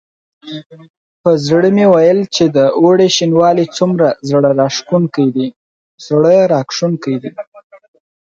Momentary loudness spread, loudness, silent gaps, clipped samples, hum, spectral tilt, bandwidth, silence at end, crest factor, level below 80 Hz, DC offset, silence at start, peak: 15 LU; -12 LUFS; 0.66-0.70 s, 0.90-1.24 s, 5.56-5.98 s, 7.47-7.52 s, 7.64-7.70 s; under 0.1%; none; -5.5 dB/octave; 7.8 kHz; 0.5 s; 12 dB; -58 dBFS; under 0.1%; 0.45 s; 0 dBFS